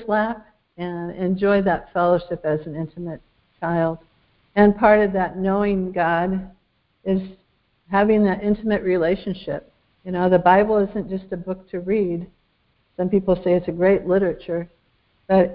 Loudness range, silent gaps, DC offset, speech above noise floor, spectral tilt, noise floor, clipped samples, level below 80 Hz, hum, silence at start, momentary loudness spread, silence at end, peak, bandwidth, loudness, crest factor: 3 LU; none; under 0.1%; 45 dB; -12 dB/octave; -65 dBFS; under 0.1%; -48 dBFS; none; 0 s; 15 LU; 0 s; -2 dBFS; 5.2 kHz; -21 LUFS; 20 dB